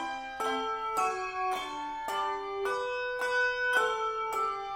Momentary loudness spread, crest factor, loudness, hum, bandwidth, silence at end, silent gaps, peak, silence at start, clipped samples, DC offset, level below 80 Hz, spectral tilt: 7 LU; 18 dB; -31 LUFS; none; 16 kHz; 0 s; none; -14 dBFS; 0 s; under 0.1%; under 0.1%; -62 dBFS; -1.5 dB/octave